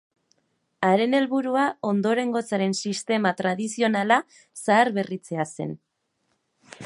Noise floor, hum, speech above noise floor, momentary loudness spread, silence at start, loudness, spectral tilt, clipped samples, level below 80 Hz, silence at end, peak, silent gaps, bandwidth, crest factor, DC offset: -73 dBFS; none; 50 dB; 10 LU; 0.8 s; -24 LUFS; -5 dB/octave; under 0.1%; -74 dBFS; 0 s; -4 dBFS; none; 11.5 kHz; 22 dB; under 0.1%